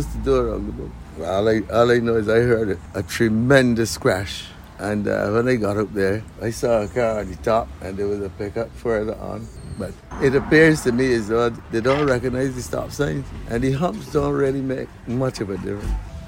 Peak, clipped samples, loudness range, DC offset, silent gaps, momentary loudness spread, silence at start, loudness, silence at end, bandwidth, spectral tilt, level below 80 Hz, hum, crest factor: -2 dBFS; under 0.1%; 5 LU; under 0.1%; none; 14 LU; 0 s; -21 LUFS; 0 s; 16.5 kHz; -6 dB/octave; -38 dBFS; none; 18 dB